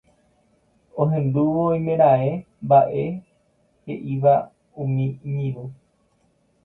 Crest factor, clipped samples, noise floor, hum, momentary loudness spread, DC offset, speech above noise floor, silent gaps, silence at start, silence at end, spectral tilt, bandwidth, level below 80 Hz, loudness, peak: 18 dB; under 0.1%; -64 dBFS; none; 18 LU; under 0.1%; 44 dB; none; 0.95 s; 0.9 s; -11.5 dB/octave; 4 kHz; -58 dBFS; -21 LUFS; -4 dBFS